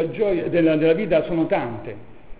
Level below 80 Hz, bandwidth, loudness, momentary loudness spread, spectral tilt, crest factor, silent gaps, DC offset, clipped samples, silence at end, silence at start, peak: -48 dBFS; 4 kHz; -20 LUFS; 14 LU; -11 dB/octave; 14 dB; none; 1%; under 0.1%; 0 s; 0 s; -6 dBFS